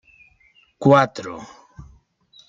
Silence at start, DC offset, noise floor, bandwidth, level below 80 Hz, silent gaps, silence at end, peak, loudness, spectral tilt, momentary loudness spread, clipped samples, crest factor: 0.8 s; under 0.1%; -58 dBFS; 7.8 kHz; -56 dBFS; none; 1.05 s; -2 dBFS; -17 LUFS; -7 dB/octave; 23 LU; under 0.1%; 20 dB